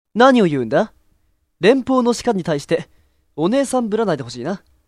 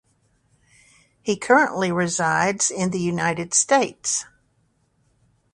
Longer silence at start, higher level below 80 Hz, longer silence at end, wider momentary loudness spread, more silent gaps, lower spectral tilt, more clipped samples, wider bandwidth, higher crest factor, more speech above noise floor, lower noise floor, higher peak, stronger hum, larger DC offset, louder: second, 0.15 s vs 1.25 s; first, -54 dBFS vs -62 dBFS; second, 0.3 s vs 1.3 s; first, 13 LU vs 8 LU; neither; first, -5.5 dB/octave vs -3.5 dB/octave; neither; first, 13 kHz vs 11.5 kHz; about the same, 18 dB vs 22 dB; about the same, 45 dB vs 45 dB; second, -62 dBFS vs -66 dBFS; about the same, 0 dBFS vs -2 dBFS; neither; neither; first, -18 LUFS vs -21 LUFS